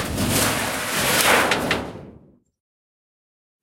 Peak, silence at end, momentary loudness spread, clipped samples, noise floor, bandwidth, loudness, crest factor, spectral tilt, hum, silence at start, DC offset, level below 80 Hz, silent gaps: -2 dBFS; 1.45 s; 9 LU; under 0.1%; -50 dBFS; 16.5 kHz; -19 LUFS; 20 dB; -2.5 dB/octave; none; 0 s; under 0.1%; -44 dBFS; none